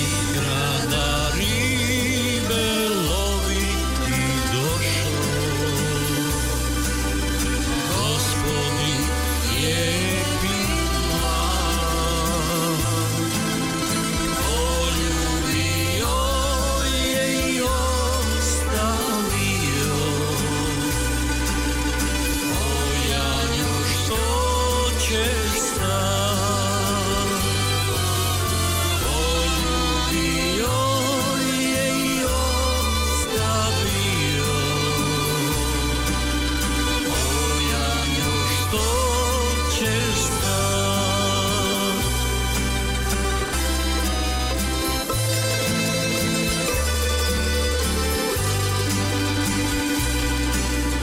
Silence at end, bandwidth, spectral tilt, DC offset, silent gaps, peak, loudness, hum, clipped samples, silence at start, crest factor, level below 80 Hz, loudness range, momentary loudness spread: 0 s; 19.5 kHz; -3.5 dB/octave; under 0.1%; none; -12 dBFS; -21 LUFS; none; under 0.1%; 0 s; 10 dB; -28 dBFS; 1 LU; 2 LU